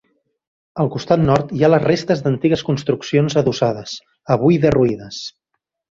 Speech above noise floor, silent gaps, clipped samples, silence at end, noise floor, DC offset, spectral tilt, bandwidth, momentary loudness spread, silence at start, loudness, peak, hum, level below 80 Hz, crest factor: 59 dB; none; under 0.1%; 0.65 s; -76 dBFS; under 0.1%; -7 dB/octave; 7.6 kHz; 16 LU; 0.75 s; -17 LUFS; 0 dBFS; none; -46 dBFS; 18 dB